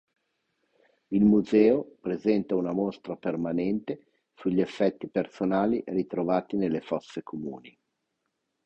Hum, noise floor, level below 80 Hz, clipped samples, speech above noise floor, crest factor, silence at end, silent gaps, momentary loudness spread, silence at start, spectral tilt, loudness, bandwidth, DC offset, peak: none; -80 dBFS; -60 dBFS; under 0.1%; 53 dB; 20 dB; 0.95 s; none; 15 LU; 1.1 s; -8.5 dB/octave; -27 LUFS; 8 kHz; under 0.1%; -8 dBFS